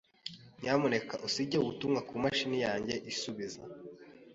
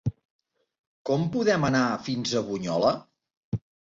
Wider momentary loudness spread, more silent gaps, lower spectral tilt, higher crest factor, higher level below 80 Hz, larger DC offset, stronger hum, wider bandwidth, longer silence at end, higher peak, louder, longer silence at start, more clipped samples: first, 16 LU vs 12 LU; second, none vs 0.25-0.39 s, 0.79-1.05 s, 3.37-3.52 s; about the same, -4.5 dB/octave vs -5.5 dB/octave; about the same, 20 dB vs 18 dB; second, -68 dBFS vs -56 dBFS; neither; neither; about the same, 8 kHz vs 8 kHz; second, 0 s vs 0.3 s; second, -14 dBFS vs -10 dBFS; second, -34 LUFS vs -26 LUFS; first, 0.25 s vs 0.05 s; neither